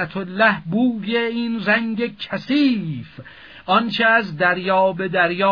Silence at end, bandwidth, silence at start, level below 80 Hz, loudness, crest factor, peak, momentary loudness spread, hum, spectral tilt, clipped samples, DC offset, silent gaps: 0 s; 5.4 kHz; 0 s; -60 dBFS; -19 LUFS; 18 dB; -2 dBFS; 10 LU; none; -7.5 dB/octave; under 0.1%; 0.2%; none